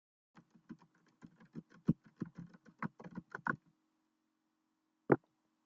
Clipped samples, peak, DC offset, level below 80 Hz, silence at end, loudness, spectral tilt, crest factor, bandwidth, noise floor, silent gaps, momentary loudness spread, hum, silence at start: under 0.1%; -12 dBFS; under 0.1%; -74 dBFS; 0.5 s; -41 LUFS; -8.5 dB/octave; 32 dB; 7.4 kHz; -83 dBFS; none; 23 LU; none; 0.7 s